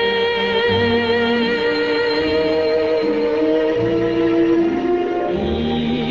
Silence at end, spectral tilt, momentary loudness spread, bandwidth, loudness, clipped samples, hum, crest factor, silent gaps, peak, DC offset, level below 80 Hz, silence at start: 0 s; -6.5 dB/octave; 4 LU; 7.2 kHz; -18 LUFS; under 0.1%; none; 12 dB; none; -6 dBFS; under 0.1%; -42 dBFS; 0 s